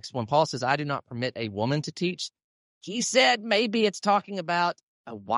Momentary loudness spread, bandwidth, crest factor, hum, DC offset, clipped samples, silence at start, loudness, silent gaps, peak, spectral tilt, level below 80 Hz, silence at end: 15 LU; 11.5 kHz; 18 dB; none; under 0.1%; under 0.1%; 0.05 s; -26 LUFS; 2.44-2.81 s, 4.83-5.04 s; -8 dBFS; -4 dB/octave; -72 dBFS; 0 s